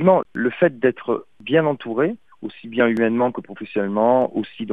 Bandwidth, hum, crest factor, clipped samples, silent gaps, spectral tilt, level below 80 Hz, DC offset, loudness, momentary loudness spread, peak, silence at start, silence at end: 4.9 kHz; none; 18 dB; under 0.1%; none; -9 dB/octave; -64 dBFS; 0.3%; -20 LUFS; 10 LU; -2 dBFS; 0 s; 0 s